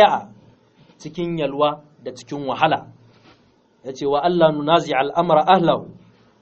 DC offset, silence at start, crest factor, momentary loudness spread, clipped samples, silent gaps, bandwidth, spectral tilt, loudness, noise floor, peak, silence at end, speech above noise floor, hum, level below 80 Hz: under 0.1%; 0 s; 20 dB; 19 LU; under 0.1%; none; 7.4 kHz; -4 dB/octave; -19 LUFS; -57 dBFS; 0 dBFS; 0.5 s; 39 dB; none; -58 dBFS